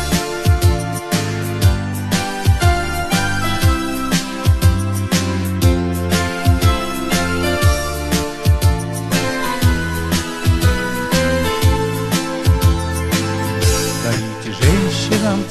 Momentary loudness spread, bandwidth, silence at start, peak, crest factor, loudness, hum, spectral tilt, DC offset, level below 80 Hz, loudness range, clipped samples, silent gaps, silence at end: 5 LU; 13 kHz; 0 s; 0 dBFS; 16 dB; -17 LUFS; none; -5 dB/octave; under 0.1%; -26 dBFS; 1 LU; under 0.1%; none; 0 s